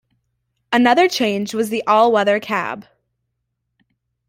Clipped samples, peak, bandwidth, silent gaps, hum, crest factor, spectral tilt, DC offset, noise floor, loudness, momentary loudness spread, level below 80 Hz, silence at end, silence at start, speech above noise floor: under 0.1%; -2 dBFS; 16 kHz; none; none; 16 dB; -4 dB/octave; under 0.1%; -75 dBFS; -17 LUFS; 9 LU; -64 dBFS; 1.5 s; 0.7 s; 58 dB